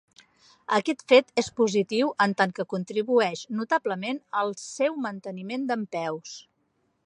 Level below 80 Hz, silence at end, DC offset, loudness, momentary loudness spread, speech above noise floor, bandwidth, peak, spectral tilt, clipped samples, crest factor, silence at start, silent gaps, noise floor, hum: -72 dBFS; 0.65 s; under 0.1%; -26 LUFS; 13 LU; 46 dB; 10.5 kHz; -4 dBFS; -4.5 dB/octave; under 0.1%; 22 dB; 0.7 s; none; -72 dBFS; none